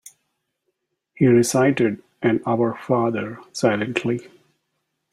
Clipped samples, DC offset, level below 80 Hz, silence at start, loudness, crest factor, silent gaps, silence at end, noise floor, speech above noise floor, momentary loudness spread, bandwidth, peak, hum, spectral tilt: under 0.1%; under 0.1%; -62 dBFS; 1.2 s; -21 LUFS; 20 dB; none; 0.85 s; -75 dBFS; 56 dB; 10 LU; 14 kHz; -2 dBFS; none; -6 dB/octave